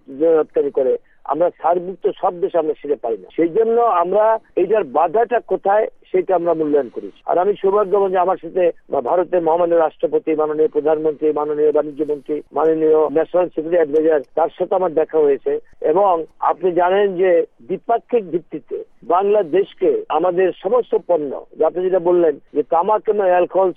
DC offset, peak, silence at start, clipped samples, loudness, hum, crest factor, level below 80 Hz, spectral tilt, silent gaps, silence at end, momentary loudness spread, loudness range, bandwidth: under 0.1%; -4 dBFS; 0.1 s; under 0.1%; -18 LUFS; none; 14 dB; -58 dBFS; -9 dB/octave; none; 0.05 s; 7 LU; 2 LU; 3.7 kHz